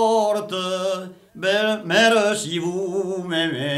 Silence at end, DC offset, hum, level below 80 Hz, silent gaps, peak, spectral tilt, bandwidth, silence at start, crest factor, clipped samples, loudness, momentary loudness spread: 0 s; under 0.1%; none; -66 dBFS; none; -6 dBFS; -3.5 dB/octave; 15 kHz; 0 s; 16 dB; under 0.1%; -21 LUFS; 10 LU